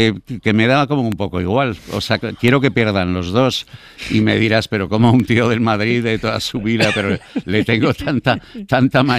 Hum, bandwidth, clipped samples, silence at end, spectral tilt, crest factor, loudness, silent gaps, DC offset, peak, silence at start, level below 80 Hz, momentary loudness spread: none; 15 kHz; under 0.1%; 0 s; -6 dB/octave; 14 dB; -16 LUFS; none; under 0.1%; -2 dBFS; 0 s; -44 dBFS; 7 LU